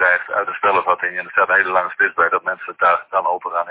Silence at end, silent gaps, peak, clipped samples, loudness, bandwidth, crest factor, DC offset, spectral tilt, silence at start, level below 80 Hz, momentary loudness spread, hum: 0 s; none; -2 dBFS; under 0.1%; -17 LUFS; 4 kHz; 16 dB; under 0.1%; -6.5 dB/octave; 0 s; -60 dBFS; 6 LU; none